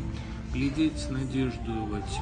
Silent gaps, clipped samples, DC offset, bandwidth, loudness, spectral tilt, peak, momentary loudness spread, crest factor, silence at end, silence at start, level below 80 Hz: none; under 0.1%; under 0.1%; 10 kHz; -31 LUFS; -6.5 dB/octave; -14 dBFS; 8 LU; 16 dB; 0 s; 0 s; -38 dBFS